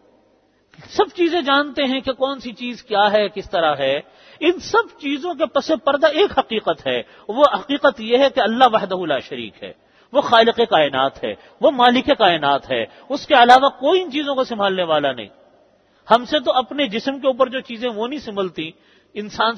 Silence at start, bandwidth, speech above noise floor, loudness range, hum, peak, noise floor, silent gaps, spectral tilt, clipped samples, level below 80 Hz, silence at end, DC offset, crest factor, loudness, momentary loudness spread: 0.85 s; 8.6 kHz; 40 dB; 5 LU; none; 0 dBFS; -58 dBFS; none; -4.5 dB/octave; under 0.1%; -56 dBFS; 0 s; under 0.1%; 18 dB; -18 LUFS; 13 LU